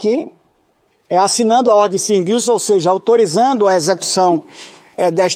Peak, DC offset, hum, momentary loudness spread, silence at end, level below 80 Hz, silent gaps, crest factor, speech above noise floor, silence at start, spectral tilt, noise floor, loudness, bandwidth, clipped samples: -2 dBFS; under 0.1%; none; 7 LU; 0 s; -66 dBFS; none; 12 dB; 46 dB; 0 s; -4 dB/octave; -59 dBFS; -14 LUFS; 16 kHz; under 0.1%